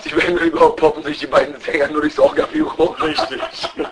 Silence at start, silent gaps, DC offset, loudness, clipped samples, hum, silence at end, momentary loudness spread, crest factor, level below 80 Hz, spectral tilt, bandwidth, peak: 0 s; none; under 0.1%; -17 LUFS; under 0.1%; none; 0 s; 10 LU; 16 dB; -44 dBFS; -5 dB/octave; 10.5 kHz; 0 dBFS